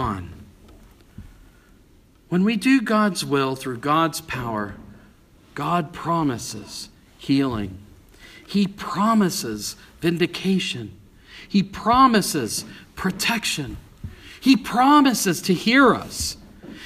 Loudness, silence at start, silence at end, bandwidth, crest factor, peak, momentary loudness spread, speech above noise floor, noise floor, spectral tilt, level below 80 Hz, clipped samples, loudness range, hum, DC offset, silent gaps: -21 LUFS; 0 s; 0 s; 15.5 kHz; 20 dB; -2 dBFS; 19 LU; 32 dB; -53 dBFS; -4.5 dB/octave; -48 dBFS; under 0.1%; 7 LU; none; under 0.1%; none